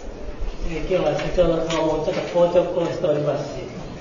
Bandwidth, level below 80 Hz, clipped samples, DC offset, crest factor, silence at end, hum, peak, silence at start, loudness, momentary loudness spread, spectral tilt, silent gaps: 7.4 kHz; -34 dBFS; under 0.1%; under 0.1%; 16 dB; 0 s; none; -6 dBFS; 0 s; -22 LUFS; 15 LU; -6 dB/octave; none